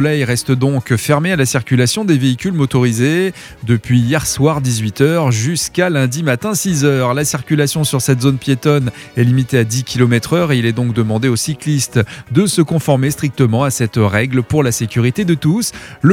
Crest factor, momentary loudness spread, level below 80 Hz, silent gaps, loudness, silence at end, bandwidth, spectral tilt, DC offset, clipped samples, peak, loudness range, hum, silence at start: 14 dB; 3 LU; -44 dBFS; none; -14 LUFS; 0 s; 16.5 kHz; -5.5 dB/octave; under 0.1%; under 0.1%; 0 dBFS; 1 LU; none; 0 s